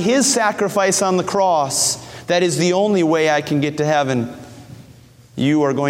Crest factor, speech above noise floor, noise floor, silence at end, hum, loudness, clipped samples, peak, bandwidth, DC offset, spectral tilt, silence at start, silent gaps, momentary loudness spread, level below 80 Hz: 14 dB; 28 dB; -45 dBFS; 0 s; none; -17 LUFS; under 0.1%; -4 dBFS; 16.5 kHz; under 0.1%; -4 dB/octave; 0 s; none; 7 LU; -56 dBFS